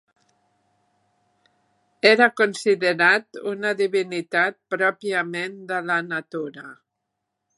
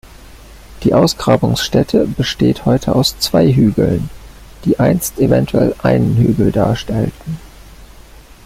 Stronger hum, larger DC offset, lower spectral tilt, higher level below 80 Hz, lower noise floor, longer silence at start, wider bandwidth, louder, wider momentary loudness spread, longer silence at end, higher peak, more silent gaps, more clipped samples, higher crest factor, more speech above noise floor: neither; neither; second, -4 dB/octave vs -6 dB/octave; second, -78 dBFS vs -34 dBFS; first, -80 dBFS vs -39 dBFS; first, 2.05 s vs 0.05 s; second, 11.5 kHz vs 16.5 kHz; second, -21 LUFS vs -14 LUFS; first, 14 LU vs 8 LU; first, 0.85 s vs 0.6 s; about the same, 0 dBFS vs 0 dBFS; neither; neither; first, 24 dB vs 14 dB; first, 58 dB vs 26 dB